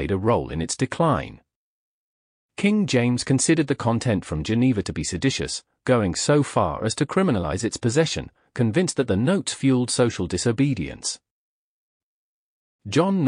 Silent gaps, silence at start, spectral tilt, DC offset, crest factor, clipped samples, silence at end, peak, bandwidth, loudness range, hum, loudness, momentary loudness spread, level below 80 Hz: 1.56-2.49 s, 11.31-12.79 s; 0 s; -5 dB/octave; under 0.1%; 16 dB; under 0.1%; 0 s; -8 dBFS; 10.5 kHz; 2 LU; none; -23 LUFS; 8 LU; -46 dBFS